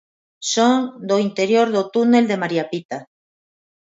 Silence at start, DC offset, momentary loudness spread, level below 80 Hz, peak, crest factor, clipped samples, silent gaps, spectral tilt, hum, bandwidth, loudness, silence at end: 0.4 s; under 0.1%; 12 LU; -70 dBFS; -4 dBFS; 16 dB; under 0.1%; 2.85-2.89 s; -4.5 dB/octave; none; 8 kHz; -18 LUFS; 0.95 s